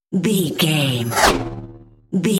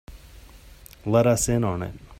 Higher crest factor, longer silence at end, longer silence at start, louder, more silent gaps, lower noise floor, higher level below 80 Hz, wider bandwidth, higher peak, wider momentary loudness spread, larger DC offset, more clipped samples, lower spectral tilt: about the same, 18 dB vs 18 dB; about the same, 0 s vs 0.05 s; about the same, 0.1 s vs 0.1 s; first, -18 LUFS vs -22 LUFS; neither; second, -40 dBFS vs -47 dBFS; first, -38 dBFS vs -44 dBFS; about the same, 16.5 kHz vs 16 kHz; first, 0 dBFS vs -8 dBFS; about the same, 11 LU vs 12 LU; neither; neither; about the same, -4.5 dB/octave vs -5.5 dB/octave